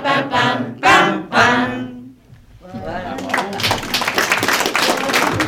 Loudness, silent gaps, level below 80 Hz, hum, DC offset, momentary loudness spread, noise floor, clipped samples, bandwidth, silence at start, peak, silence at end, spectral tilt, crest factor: -16 LUFS; none; -46 dBFS; none; under 0.1%; 15 LU; -44 dBFS; under 0.1%; over 20 kHz; 0 s; -2 dBFS; 0 s; -3 dB/octave; 16 dB